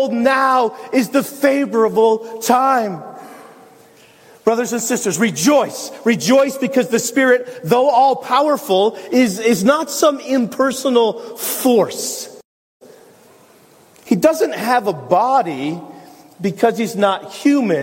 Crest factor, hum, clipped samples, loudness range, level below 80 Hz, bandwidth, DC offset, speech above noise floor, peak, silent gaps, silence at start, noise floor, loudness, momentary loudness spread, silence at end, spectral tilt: 16 dB; none; under 0.1%; 5 LU; -66 dBFS; 16.5 kHz; under 0.1%; 32 dB; 0 dBFS; 12.45-12.80 s; 0 s; -48 dBFS; -16 LUFS; 9 LU; 0 s; -4 dB/octave